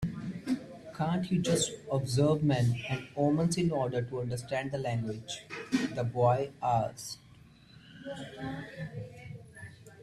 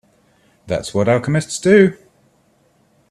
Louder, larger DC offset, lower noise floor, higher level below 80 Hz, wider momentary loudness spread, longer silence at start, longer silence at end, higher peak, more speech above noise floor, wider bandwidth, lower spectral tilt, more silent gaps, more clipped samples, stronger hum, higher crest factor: second, -32 LUFS vs -16 LUFS; neither; about the same, -56 dBFS vs -58 dBFS; second, -60 dBFS vs -52 dBFS; first, 17 LU vs 11 LU; second, 0 s vs 0.65 s; second, 0 s vs 1.15 s; second, -14 dBFS vs 0 dBFS; second, 25 dB vs 43 dB; about the same, 13.5 kHz vs 12.5 kHz; about the same, -6 dB/octave vs -6 dB/octave; neither; neither; neither; about the same, 18 dB vs 18 dB